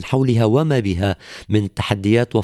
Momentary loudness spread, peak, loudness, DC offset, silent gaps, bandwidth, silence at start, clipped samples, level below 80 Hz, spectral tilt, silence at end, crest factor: 6 LU; -4 dBFS; -18 LUFS; under 0.1%; none; 12.5 kHz; 0 s; under 0.1%; -44 dBFS; -7.5 dB/octave; 0 s; 14 dB